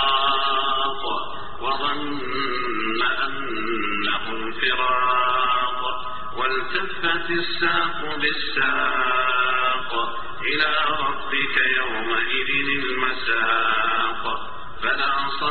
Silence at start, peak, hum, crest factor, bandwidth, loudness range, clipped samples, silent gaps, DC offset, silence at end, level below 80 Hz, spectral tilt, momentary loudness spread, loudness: 0 s; -6 dBFS; none; 18 dB; 4.8 kHz; 3 LU; under 0.1%; none; 4%; 0 s; -48 dBFS; 0.5 dB/octave; 8 LU; -22 LUFS